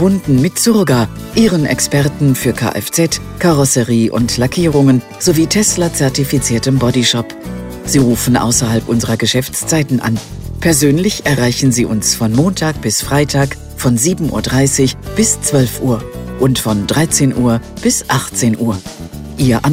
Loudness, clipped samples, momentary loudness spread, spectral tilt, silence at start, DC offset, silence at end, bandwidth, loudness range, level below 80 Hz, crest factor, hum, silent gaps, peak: -13 LUFS; under 0.1%; 6 LU; -4.5 dB/octave; 0 s; under 0.1%; 0 s; 16.5 kHz; 2 LU; -34 dBFS; 14 dB; none; none; 0 dBFS